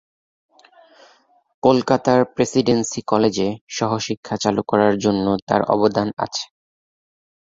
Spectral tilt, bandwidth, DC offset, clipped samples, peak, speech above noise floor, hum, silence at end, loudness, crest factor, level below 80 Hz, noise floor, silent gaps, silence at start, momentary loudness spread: -5 dB/octave; 7.8 kHz; under 0.1%; under 0.1%; -2 dBFS; 36 dB; none; 1.15 s; -19 LUFS; 18 dB; -54 dBFS; -55 dBFS; 3.61-3.67 s, 4.17-4.23 s, 5.42-5.47 s; 1.65 s; 8 LU